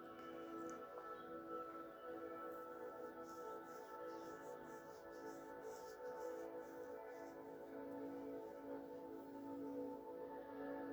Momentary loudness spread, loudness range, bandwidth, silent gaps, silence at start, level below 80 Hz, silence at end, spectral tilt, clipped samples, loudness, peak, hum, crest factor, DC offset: 4 LU; 1 LU; over 20 kHz; none; 0 s; -84 dBFS; 0 s; -5.5 dB/octave; under 0.1%; -53 LUFS; -38 dBFS; none; 14 dB; under 0.1%